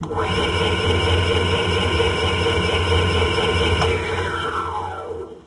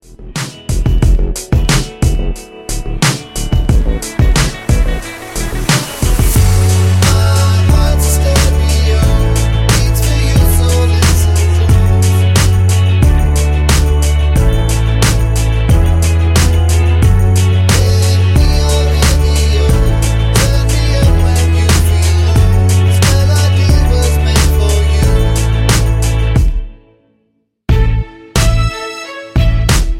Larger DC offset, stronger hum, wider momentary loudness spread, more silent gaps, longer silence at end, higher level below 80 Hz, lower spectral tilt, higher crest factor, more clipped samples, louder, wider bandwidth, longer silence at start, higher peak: neither; neither; about the same, 7 LU vs 7 LU; neither; about the same, 0.05 s vs 0 s; second, -32 dBFS vs -14 dBFS; about the same, -5 dB/octave vs -5 dB/octave; about the same, 14 dB vs 10 dB; neither; second, -20 LUFS vs -12 LUFS; second, 11.5 kHz vs 16 kHz; about the same, 0 s vs 0.1 s; second, -6 dBFS vs 0 dBFS